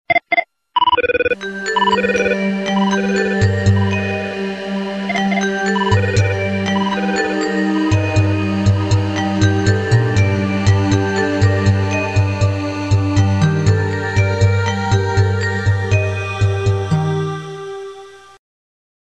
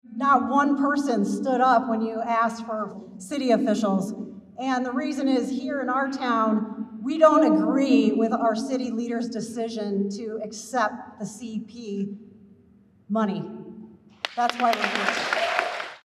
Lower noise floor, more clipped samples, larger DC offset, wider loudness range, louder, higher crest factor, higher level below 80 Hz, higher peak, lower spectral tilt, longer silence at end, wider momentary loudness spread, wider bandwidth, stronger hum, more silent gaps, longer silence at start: second, -37 dBFS vs -56 dBFS; neither; first, 0.1% vs under 0.1%; second, 2 LU vs 9 LU; first, -16 LUFS vs -24 LUFS; second, 14 dB vs 22 dB; first, -38 dBFS vs -76 dBFS; first, 0 dBFS vs -4 dBFS; about the same, -6 dB/octave vs -5 dB/octave; first, 0.85 s vs 0.1 s; second, 6 LU vs 14 LU; second, 8.4 kHz vs 13 kHz; neither; neither; about the same, 0.1 s vs 0.1 s